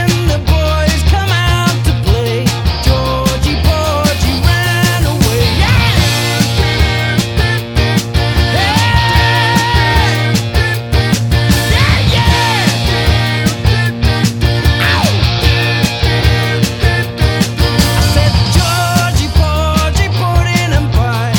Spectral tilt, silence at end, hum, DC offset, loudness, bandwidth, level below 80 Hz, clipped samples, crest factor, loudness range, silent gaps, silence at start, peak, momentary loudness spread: -5 dB/octave; 0 s; none; under 0.1%; -12 LUFS; 17.5 kHz; -18 dBFS; under 0.1%; 10 dB; 1 LU; none; 0 s; 0 dBFS; 3 LU